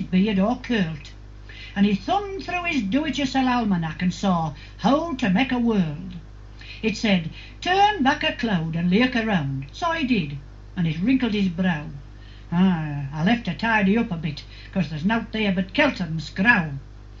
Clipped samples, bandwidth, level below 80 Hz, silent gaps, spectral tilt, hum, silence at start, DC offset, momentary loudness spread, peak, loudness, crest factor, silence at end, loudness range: under 0.1%; 7.6 kHz; -42 dBFS; none; -6.5 dB/octave; 50 Hz at -40 dBFS; 0 s; under 0.1%; 13 LU; -4 dBFS; -23 LUFS; 20 dB; 0 s; 2 LU